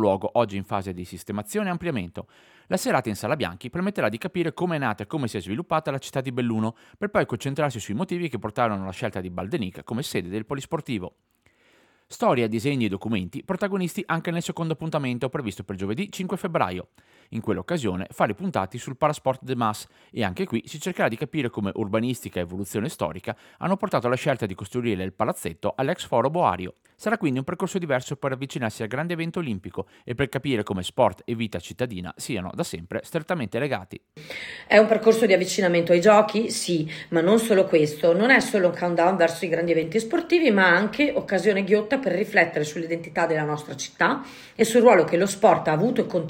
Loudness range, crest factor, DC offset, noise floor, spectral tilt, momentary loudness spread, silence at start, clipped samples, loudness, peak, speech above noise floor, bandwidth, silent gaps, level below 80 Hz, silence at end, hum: 8 LU; 20 dB; under 0.1%; -60 dBFS; -5.5 dB/octave; 12 LU; 0 s; under 0.1%; -24 LUFS; -4 dBFS; 36 dB; 18.5 kHz; none; -62 dBFS; 0 s; none